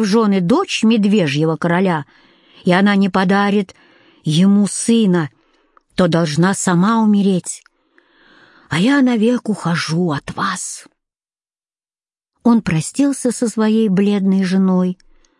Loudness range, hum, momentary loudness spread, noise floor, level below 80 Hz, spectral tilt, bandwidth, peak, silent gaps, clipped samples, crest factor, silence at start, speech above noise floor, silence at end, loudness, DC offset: 5 LU; none; 9 LU; under -90 dBFS; -56 dBFS; -5.5 dB/octave; 11.5 kHz; -2 dBFS; none; under 0.1%; 14 dB; 0 s; over 75 dB; 0.45 s; -15 LUFS; under 0.1%